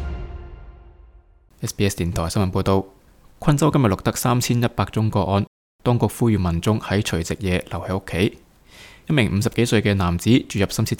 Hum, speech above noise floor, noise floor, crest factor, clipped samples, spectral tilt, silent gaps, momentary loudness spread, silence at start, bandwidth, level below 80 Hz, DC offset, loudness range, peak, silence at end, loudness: none; 31 dB; -51 dBFS; 18 dB; under 0.1%; -6 dB/octave; 5.47-5.79 s; 12 LU; 0 s; 18 kHz; -40 dBFS; under 0.1%; 3 LU; -2 dBFS; 0.05 s; -21 LUFS